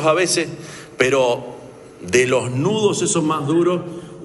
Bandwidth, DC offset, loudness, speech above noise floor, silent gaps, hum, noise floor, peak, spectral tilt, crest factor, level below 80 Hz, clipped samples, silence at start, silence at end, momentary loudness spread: 11.5 kHz; under 0.1%; -18 LUFS; 20 dB; none; none; -38 dBFS; 0 dBFS; -4 dB/octave; 18 dB; -56 dBFS; under 0.1%; 0 s; 0 s; 18 LU